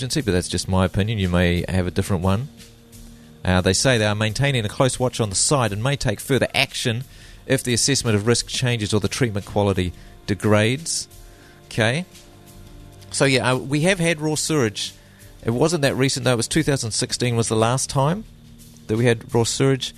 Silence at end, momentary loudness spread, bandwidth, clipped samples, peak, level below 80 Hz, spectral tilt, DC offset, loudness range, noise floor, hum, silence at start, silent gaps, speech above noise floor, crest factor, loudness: 0.05 s; 9 LU; 13.5 kHz; under 0.1%; -2 dBFS; -42 dBFS; -4.5 dB/octave; under 0.1%; 3 LU; -45 dBFS; none; 0 s; none; 24 dB; 20 dB; -21 LUFS